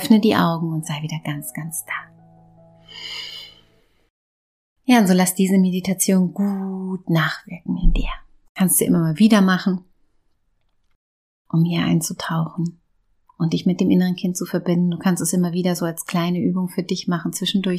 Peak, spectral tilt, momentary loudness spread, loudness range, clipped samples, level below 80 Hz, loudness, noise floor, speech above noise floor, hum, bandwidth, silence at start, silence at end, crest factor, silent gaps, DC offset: -2 dBFS; -5 dB/octave; 14 LU; 8 LU; under 0.1%; -34 dBFS; -20 LUFS; -64 dBFS; 46 dB; none; 15.5 kHz; 0 s; 0 s; 18 dB; 4.10-4.76 s, 8.49-8.55 s, 10.95-11.45 s; under 0.1%